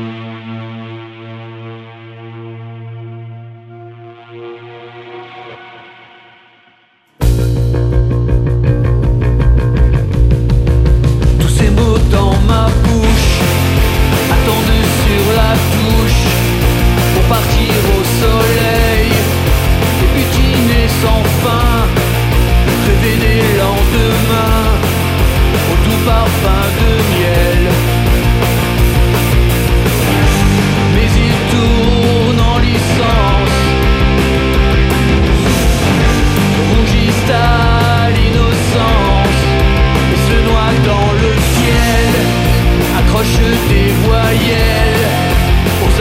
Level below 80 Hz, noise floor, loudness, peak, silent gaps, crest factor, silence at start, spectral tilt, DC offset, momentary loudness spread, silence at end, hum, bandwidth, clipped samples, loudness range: -16 dBFS; -51 dBFS; -11 LUFS; 0 dBFS; none; 10 dB; 0 s; -5.5 dB/octave; under 0.1%; 15 LU; 0 s; none; 16.5 kHz; under 0.1%; 7 LU